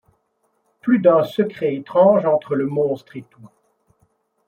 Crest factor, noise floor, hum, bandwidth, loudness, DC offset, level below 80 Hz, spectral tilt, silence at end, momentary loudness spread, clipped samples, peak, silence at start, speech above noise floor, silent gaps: 18 dB; -68 dBFS; none; 13 kHz; -18 LUFS; under 0.1%; -68 dBFS; -8.5 dB/octave; 1 s; 14 LU; under 0.1%; -2 dBFS; 0.85 s; 50 dB; none